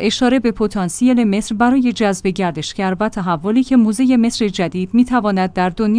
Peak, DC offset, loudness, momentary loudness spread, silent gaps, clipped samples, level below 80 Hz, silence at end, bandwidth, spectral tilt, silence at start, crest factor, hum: -2 dBFS; under 0.1%; -16 LUFS; 6 LU; none; under 0.1%; -42 dBFS; 0 s; 10.5 kHz; -5.5 dB/octave; 0 s; 12 dB; none